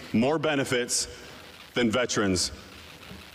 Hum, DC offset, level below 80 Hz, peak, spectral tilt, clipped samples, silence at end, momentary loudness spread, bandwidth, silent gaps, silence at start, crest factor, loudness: none; under 0.1%; -54 dBFS; -16 dBFS; -3.5 dB/octave; under 0.1%; 0.05 s; 19 LU; 15.5 kHz; none; 0 s; 12 dB; -26 LUFS